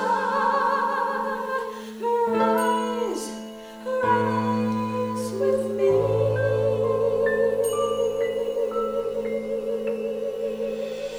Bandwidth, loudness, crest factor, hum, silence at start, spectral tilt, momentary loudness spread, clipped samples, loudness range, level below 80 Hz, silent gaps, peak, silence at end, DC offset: over 20 kHz; -24 LUFS; 14 dB; none; 0 s; -5.5 dB/octave; 8 LU; under 0.1%; 3 LU; -56 dBFS; none; -10 dBFS; 0 s; under 0.1%